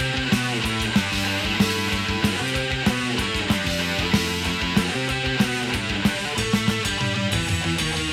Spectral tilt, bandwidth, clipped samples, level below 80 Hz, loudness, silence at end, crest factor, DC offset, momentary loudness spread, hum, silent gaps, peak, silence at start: -4 dB/octave; 16.5 kHz; under 0.1%; -38 dBFS; -22 LUFS; 0 s; 18 dB; under 0.1%; 2 LU; none; none; -6 dBFS; 0 s